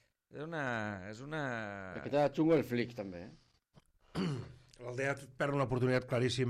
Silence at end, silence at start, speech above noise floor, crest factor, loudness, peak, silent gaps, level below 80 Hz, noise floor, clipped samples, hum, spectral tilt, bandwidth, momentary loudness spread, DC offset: 0 s; 0.35 s; 33 dB; 18 dB; -36 LUFS; -18 dBFS; none; -64 dBFS; -68 dBFS; under 0.1%; none; -6.5 dB/octave; 14 kHz; 16 LU; under 0.1%